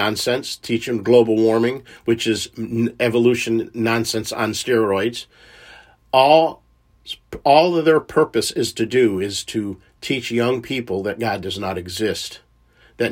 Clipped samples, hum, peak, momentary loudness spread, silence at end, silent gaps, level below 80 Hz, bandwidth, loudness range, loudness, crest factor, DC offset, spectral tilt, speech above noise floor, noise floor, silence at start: under 0.1%; none; 0 dBFS; 11 LU; 0 s; none; -56 dBFS; 16.5 kHz; 6 LU; -19 LUFS; 18 dB; under 0.1%; -4.5 dB/octave; 35 dB; -54 dBFS; 0 s